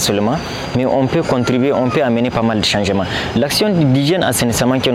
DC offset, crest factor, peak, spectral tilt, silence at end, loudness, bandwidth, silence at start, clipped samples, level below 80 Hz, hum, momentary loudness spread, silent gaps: under 0.1%; 10 dB; -4 dBFS; -5 dB/octave; 0 s; -15 LUFS; 17 kHz; 0 s; under 0.1%; -40 dBFS; none; 4 LU; none